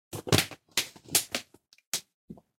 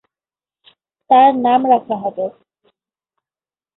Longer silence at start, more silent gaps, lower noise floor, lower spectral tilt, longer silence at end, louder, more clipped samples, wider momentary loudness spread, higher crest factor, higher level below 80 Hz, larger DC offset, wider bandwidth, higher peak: second, 0.1 s vs 1.1 s; first, 1.86-1.92 s, 2.14-2.28 s vs none; second, -52 dBFS vs under -90 dBFS; second, -2.5 dB/octave vs -10 dB/octave; second, 0.25 s vs 1.5 s; second, -29 LUFS vs -15 LUFS; neither; second, 9 LU vs 14 LU; first, 26 dB vs 16 dB; first, -60 dBFS vs -66 dBFS; neither; first, 17 kHz vs 4.1 kHz; second, -6 dBFS vs -2 dBFS